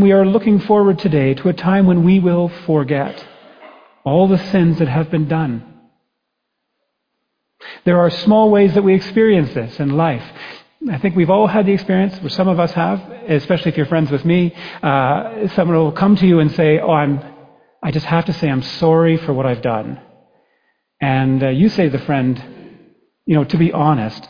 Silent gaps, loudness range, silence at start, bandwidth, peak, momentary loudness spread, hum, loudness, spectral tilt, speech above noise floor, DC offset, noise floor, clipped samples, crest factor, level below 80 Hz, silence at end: none; 4 LU; 0 s; 5.2 kHz; -2 dBFS; 11 LU; none; -15 LUFS; -9 dB/octave; 60 dB; under 0.1%; -74 dBFS; under 0.1%; 14 dB; -48 dBFS; 0.05 s